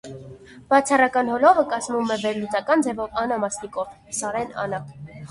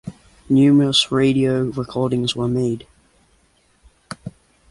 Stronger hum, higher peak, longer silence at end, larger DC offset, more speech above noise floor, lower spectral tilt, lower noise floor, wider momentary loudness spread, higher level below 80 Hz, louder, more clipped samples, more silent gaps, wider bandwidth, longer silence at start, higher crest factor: neither; about the same, -2 dBFS vs -4 dBFS; second, 0.05 s vs 0.4 s; neither; second, 21 dB vs 42 dB; second, -4 dB/octave vs -5.5 dB/octave; second, -43 dBFS vs -59 dBFS; second, 15 LU vs 21 LU; second, -58 dBFS vs -50 dBFS; second, -22 LUFS vs -18 LUFS; neither; neither; about the same, 11.5 kHz vs 11.5 kHz; about the same, 0.05 s vs 0.05 s; about the same, 20 dB vs 16 dB